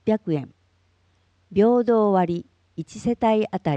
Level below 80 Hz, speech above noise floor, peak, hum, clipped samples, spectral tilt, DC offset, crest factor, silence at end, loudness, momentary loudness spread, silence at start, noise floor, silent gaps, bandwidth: -58 dBFS; 43 dB; -6 dBFS; none; under 0.1%; -8 dB/octave; under 0.1%; 16 dB; 0 s; -22 LUFS; 18 LU; 0.05 s; -64 dBFS; none; 8.8 kHz